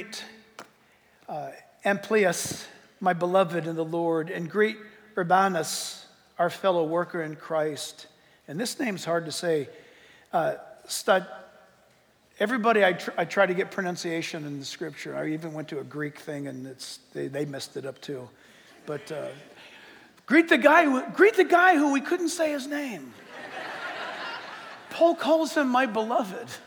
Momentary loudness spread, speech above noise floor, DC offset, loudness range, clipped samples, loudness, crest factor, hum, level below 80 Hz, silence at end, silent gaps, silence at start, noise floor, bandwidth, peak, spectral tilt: 19 LU; 36 dB; under 0.1%; 13 LU; under 0.1%; -26 LUFS; 22 dB; none; -78 dBFS; 0 s; none; 0 s; -62 dBFS; over 20 kHz; -4 dBFS; -4.5 dB/octave